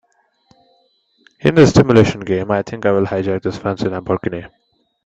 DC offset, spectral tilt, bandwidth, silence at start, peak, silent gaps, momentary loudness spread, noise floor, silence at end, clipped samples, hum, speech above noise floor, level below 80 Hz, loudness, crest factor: under 0.1%; -7 dB/octave; 8.4 kHz; 1.45 s; 0 dBFS; none; 11 LU; -59 dBFS; 0.6 s; under 0.1%; none; 44 dB; -44 dBFS; -16 LUFS; 16 dB